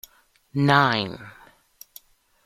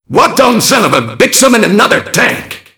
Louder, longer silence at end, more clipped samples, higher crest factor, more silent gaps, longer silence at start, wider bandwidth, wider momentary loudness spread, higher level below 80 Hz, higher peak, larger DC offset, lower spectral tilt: second, -21 LUFS vs -8 LUFS; first, 1.15 s vs 0.2 s; second, under 0.1% vs 3%; first, 22 dB vs 10 dB; neither; first, 0.55 s vs 0.1 s; second, 15.5 kHz vs over 20 kHz; first, 16 LU vs 4 LU; second, -60 dBFS vs -44 dBFS; second, -4 dBFS vs 0 dBFS; neither; first, -6 dB/octave vs -3 dB/octave